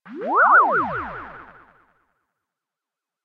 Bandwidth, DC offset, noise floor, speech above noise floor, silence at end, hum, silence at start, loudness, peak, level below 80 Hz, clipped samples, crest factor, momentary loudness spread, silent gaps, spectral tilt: 5.2 kHz; under 0.1%; -87 dBFS; 69 dB; 1.8 s; none; 0.05 s; -17 LUFS; -6 dBFS; -56 dBFS; under 0.1%; 18 dB; 22 LU; none; -7.5 dB/octave